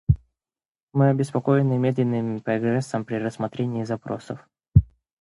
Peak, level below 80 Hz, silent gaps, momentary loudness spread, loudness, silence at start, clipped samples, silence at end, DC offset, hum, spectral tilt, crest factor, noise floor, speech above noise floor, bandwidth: -2 dBFS; -38 dBFS; 0.68-0.72 s, 0.83-0.87 s; 11 LU; -24 LUFS; 0.1 s; under 0.1%; 0.4 s; under 0.1%; none; -8.5 dB/octave; 22 dB; under -90 dBFS; over 67 dB; 11.5 kHz